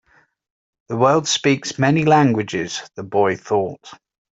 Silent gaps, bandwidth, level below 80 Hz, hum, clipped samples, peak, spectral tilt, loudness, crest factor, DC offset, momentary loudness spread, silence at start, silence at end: none; 8 kHz; -60 dBFS; none; under 0.1%; -2 dBFS; -5 dB/octave; -18 LUFS; 18 dB; under 0.1%; 14 LU; 0.9 s; 0.4 s